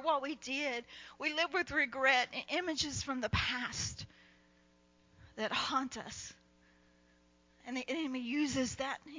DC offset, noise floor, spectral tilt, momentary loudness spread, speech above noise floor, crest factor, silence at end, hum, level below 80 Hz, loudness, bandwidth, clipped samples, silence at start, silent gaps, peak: under 0.1%; -68 dBFS; -3 dB/octave; 15 LU; 32 dB; 22 dB; 0 s; 60 Hz at -70 dBFS; -58 dBFS; -35 LUFS; 7.6 kHz; under 0.1%; 0 s; none; -16 dBFS